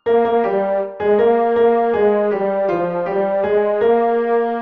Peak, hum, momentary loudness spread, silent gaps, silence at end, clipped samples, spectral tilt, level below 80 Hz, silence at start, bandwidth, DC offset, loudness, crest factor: -4 dBFS; none; 5 LU; none; 0 s; under 0.1%; -9 dB/octave; -56 dBFS; 0.05 s; 4.7 kHz; 0.2%; -17 LUFS; 12 dB